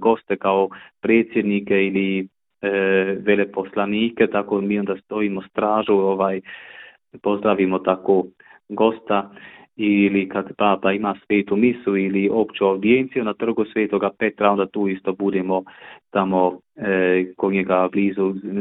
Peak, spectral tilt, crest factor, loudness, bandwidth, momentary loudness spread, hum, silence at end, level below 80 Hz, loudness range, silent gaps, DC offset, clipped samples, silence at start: -2 dBFS; -11 dB/octave; 18 dB; -20 LUFS; 4 kHz; 8 LU; none; 0 s; -60 dBFS; 2 LU; none; under 0.1%; under 0.1%; 0 s